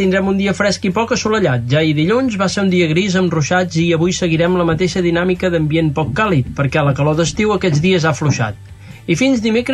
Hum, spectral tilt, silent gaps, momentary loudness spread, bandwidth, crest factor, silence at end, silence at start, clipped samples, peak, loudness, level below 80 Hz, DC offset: none; -5.5 dB/octave; none; 3 LU; 11.5 kHz; 12 dB; 0 s; 0 s; under 0.1%; -2 dBFS; -15 LUFS; -38 dBFS; under 0.1%